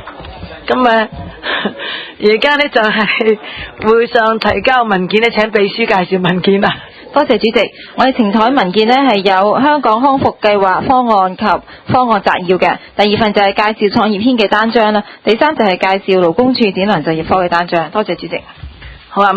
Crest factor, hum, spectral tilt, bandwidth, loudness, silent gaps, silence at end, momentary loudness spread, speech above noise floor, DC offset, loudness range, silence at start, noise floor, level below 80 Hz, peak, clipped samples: 12 dB; none; -6.5 dB/octave; 8 kHz; -12 LUFS; none; 0 s; 8 LU; 20 dB; under 0.1%; 2 LU; 0 s; -32 dBFS; -42 dBFS; 0 dBFS; 0.3%